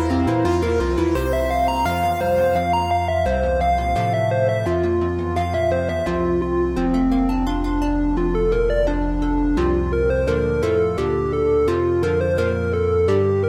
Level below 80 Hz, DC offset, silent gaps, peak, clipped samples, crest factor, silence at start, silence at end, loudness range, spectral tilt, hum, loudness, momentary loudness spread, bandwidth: -28 dBFS; under 0.1%; none; -6 dBFS; under 0.1%; 12 dB; 0 s; 0 s; 1 LU; -7.5 dB/octave; none; -20 LUFS; 3 LU; 17.5 kHz